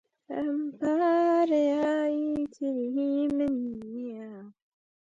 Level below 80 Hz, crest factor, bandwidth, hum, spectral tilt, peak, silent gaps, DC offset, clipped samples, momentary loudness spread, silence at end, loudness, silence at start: -66 dBFS; 12 dB; 7.6 kHz; none; -6.5 dB/octave; -16 dBFS; none; under 0.1%; under 0.1%; 15 LU; 0.55 s; -28 LUFS; 0.3 s